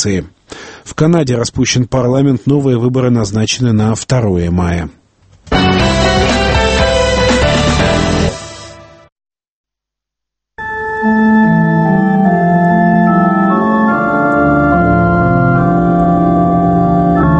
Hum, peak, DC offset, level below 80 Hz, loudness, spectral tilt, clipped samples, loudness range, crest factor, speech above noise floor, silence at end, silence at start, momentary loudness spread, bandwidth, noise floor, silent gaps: none; 0 dBFS; under 0.1%; -26 dBFS; -11 LUFS; -6 dB/octave; under 0.1%; 5 LU; 12 dB; 70 dB; 0 s; 0 s; 8 LU; 8.8 kHz; -82 dBFS; 9.12-9.16 s, 9.48-9.64 s